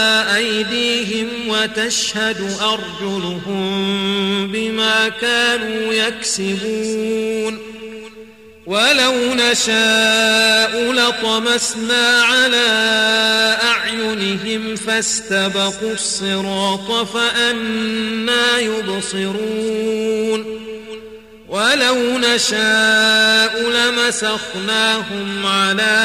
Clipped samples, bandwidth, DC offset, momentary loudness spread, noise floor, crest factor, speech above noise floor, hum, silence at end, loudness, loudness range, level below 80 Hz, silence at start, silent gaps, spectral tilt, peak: under 0.1%; 15.5 kHz; 0.2%; 10 LU; -40 dBFS; 16 dB; 23 dB; none; 0 s; -15 LUFS; 6 LU; -56 dBFS; 0 s; none; -2 dB/octave; -2 dBFS